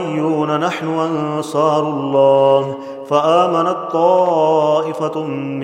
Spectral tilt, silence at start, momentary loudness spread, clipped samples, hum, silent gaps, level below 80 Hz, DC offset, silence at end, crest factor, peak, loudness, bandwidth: -6.5 dB/octave; 0 s; 8 LU; under 0.1%; none; none; -66 dBFS; under 0.1%; 0 s; 16 dB; 0 dBFS; -16 LUFS; 11 kHz